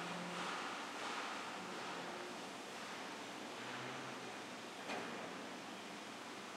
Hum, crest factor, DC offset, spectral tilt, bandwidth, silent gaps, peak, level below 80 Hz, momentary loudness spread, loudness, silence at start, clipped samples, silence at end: none; 16 dB; under 0.1%; -3 dB/octave; 16 kHz; none; -32 dBFS; under -90 dBFS; 6 LU; -46 LUFS; 0 s; under 0.1%; 0 s